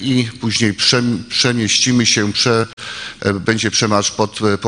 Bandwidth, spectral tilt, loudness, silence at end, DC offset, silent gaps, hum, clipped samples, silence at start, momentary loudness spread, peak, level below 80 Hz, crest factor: 10.5 kHz; -3.5 dB/octave; -15 LUFS; 0 s; under 0.1%; 2.73-2.77 s; none; under 0.1%; 0 s; 7 LU; 0 dBFS; -50 dBFS; 16 dB